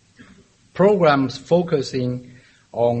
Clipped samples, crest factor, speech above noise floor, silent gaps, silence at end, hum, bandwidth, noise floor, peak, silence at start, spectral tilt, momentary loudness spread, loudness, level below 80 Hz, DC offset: under 0.1%; 18 dB; 33 dB; none; 0 s; none; 8.4 kHz; -52 dBFS; -2 dBFS; 0.75 s; -7 dB/octave; 17 LU; -19 LUFS; -56 dBFS; under 0.1%